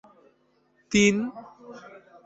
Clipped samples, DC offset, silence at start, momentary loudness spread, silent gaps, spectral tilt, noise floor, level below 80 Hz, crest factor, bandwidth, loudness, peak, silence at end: under 0.1%; under 0.1%; 0.9 s; 25 LU; none; -4 dB/octave; -66 dBFS; -60 dBFS; 20 dB; 8 kHz; -23 LUFS; -8 dBFS; 0.45 s